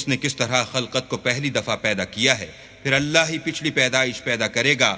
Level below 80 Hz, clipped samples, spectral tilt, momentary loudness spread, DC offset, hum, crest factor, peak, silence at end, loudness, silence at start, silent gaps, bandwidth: -54 dBFS; under 0.1%; -3 dB/octave; 6 LU; under 0.1%; none; 22 dB; 0 dBFS; 0 s; -21 LUFS; 0 s; none; 8 kHz